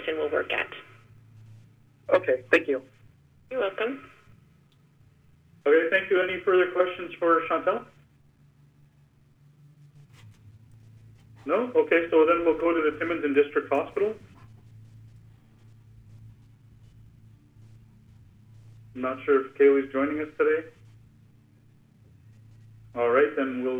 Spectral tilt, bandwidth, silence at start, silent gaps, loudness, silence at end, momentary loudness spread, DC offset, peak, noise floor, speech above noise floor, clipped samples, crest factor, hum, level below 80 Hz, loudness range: -6.5 dB/octave; 8.2 kHz; 0 s; none; -25 LUFS; 0 s; 12 LU; under 0.1%; -6 dBFS; -60 dBFS; 35 dB; under 0.1%; 22 dB; none; -64 dBFS; 9 LU